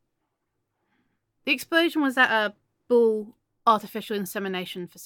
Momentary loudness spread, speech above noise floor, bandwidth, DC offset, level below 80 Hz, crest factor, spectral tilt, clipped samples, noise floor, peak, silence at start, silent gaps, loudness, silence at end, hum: 11 LU; 55 dB; 17.5 kHz; under 0.1%; -76 dBFS; 20 dB; -4 dB/octave; under 0.1%; -79 dBFS; -6 dBFS; 1.45 s; none; -24 LUFS; 0 s; none